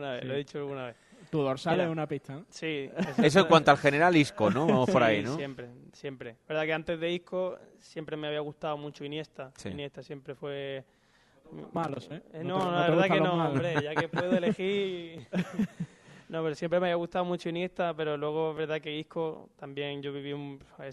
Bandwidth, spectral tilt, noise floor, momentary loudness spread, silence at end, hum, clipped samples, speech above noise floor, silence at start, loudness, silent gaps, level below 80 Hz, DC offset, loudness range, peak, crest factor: 12 kHz; -6 dB/octave; -64 dBFS; 19 LU; 0 s; none; under 0.1%; 34 dB; 0 s; -29 LUFS; none; -66 dBFS; under 0.1%; 13 LU; -6 dBFS; 24 dB